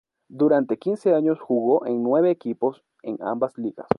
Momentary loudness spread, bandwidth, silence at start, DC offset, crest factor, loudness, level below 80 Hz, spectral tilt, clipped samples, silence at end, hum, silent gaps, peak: 10 LU; 10.5 kHz; 0.3 s; under 0.1%; 20 dB; -23 LUFS; -66 dBFS; -9 dB/octave; under 0.1%; 0.05 s; none; none; -2 dBFS